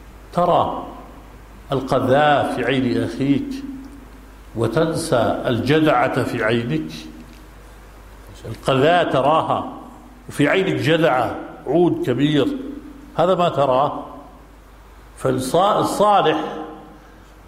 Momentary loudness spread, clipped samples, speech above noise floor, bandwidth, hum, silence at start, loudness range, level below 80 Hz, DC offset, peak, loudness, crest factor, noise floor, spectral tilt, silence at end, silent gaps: 18 LU; under 0.1%; 26 dB; 15.5 kHz; none; 0 s; 3 LU; -44 dBFS; under 0.1%; -4 dBFS; -19 LUFS; 16 dB; -44 dBFS; -6 dB/octave; 0.5 s; none